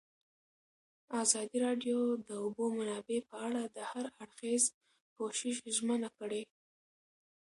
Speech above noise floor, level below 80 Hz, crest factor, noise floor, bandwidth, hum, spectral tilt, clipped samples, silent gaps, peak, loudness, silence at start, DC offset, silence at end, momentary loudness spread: over 54 dB; -84 dBFS; 24 dB; under -90 dBFS; 11.5 kHz; none; -2.5 dB/octave; under 0.1%; 4.74-4.81 s, 5.01-5.16 s; -14 dBFS; -36 LUFS; 1.1 s; under 0.1%; 1.1 s; 11 LU